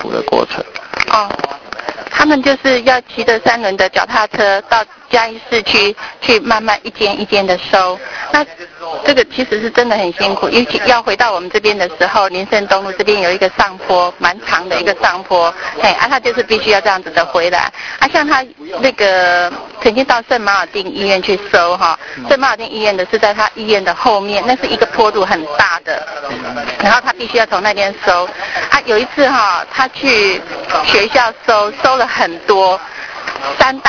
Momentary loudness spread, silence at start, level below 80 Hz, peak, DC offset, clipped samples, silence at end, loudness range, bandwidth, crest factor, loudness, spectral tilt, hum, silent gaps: 8 LU; 0 s; -46 dBFS; 0 dBFS; under 0.1%; 0.3%; 0 s; 2 LU; 5.4 kHz; 14 dB; -12 LUFS; -3 dB/octave; none; none